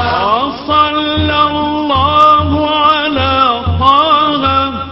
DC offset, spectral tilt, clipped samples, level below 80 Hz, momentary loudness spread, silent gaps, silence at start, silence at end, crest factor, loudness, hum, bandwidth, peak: under 0.1%; -7 dB/octave; 0.1%; -26 dBFS; 5 LU; none; 0 s; 0 s; 12 dB; -11 LUFS; none; 8 kHz; 0 dBFS